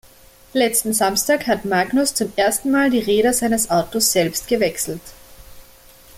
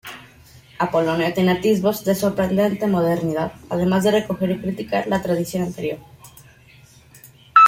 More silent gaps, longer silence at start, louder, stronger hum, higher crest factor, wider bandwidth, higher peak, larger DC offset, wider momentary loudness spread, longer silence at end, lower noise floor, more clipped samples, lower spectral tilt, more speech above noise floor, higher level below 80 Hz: neither; first, 0.55 s vs 0.05 s; first, -18 LUFS vs -21 LUFS; first, 60 Hz at -45 dBFS vs none; about the same, 16 dB vs 20 dB; about the same, 16.5 kHz vs 16.5 kHz; second, -4 dBFS vs 0 dBFS; neither; second, 4 LU vs 8 LU; about the same, 0 s vs 0 s; about the same, -47 dBFS vs -49 dBFS; neither; second, -3 dB/octave vs -6 dB/octave; about the same, 29 dB vs 29 dB; about the same, -48 dBFS vs -52 dBFS